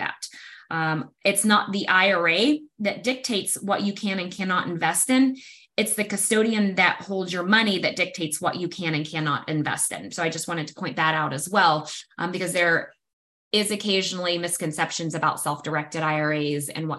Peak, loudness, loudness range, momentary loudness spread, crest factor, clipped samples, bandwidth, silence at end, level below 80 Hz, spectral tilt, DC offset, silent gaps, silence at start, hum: -4 dBFS; -23 LUFS; 3 LU; 9 LU; 20 dB; under 0.1%; 14 kHz; 0 s; -70 dBFS; -3.5 dB/octave; under 0.1%; 13.13-13.51 s; 0 s; none